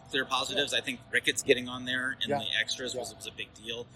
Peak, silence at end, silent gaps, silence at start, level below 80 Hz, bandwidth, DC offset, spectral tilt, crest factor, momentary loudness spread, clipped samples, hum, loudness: -8 dBFS; 0 s; none; 0 s; -64 dBFS; 16.5 kHz; under 0.1%; -2 dB/octave; 24 dB; 12 LU; under 0.1%; none; -30 LUFS